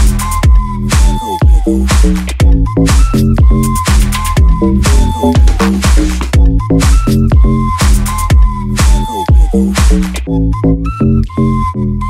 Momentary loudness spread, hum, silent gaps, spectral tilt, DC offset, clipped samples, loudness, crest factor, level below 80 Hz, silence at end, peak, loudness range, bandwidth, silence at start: 3 LU; none; none; -6 dB/octave; under 0.1%; under 0.1%; -11 LUFS; 8 dB; -10 dBFS; 0 s; 0 dBFS; 1 LU; 16 kHz; 0 s